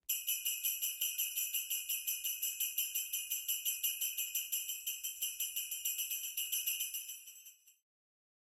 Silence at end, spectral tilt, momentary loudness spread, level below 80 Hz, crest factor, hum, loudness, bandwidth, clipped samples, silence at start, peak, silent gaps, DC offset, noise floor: 0.8 s; 7.5 dB/octave; 4 LU; -88 dBFS; 20 dB; none; -36 LUFS; 16.5 kHz; under 0.1%; 0.1 s; -20 dBFS; none; under 0.1%; -59 dBFS